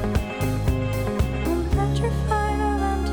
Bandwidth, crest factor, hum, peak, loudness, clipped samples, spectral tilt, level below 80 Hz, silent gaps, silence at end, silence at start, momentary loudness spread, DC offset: 20 kHz; 12 dB; none; -10 dBFS; -24 LUFS; under 0.1%; -7 dB/octave; -28 dBFS; none; 0 s; 0 s; 2 LU; under 0.1%